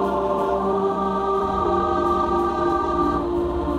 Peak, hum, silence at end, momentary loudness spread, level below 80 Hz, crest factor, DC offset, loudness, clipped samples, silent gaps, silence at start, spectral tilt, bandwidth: -10 dBFS; none; 0 s; 2 LU; -38 dBFS; 12 dB; under 0.1%; -22 LUFS; under 0.1%; none; 0 s; -7.5 dB/octave; 11 kHz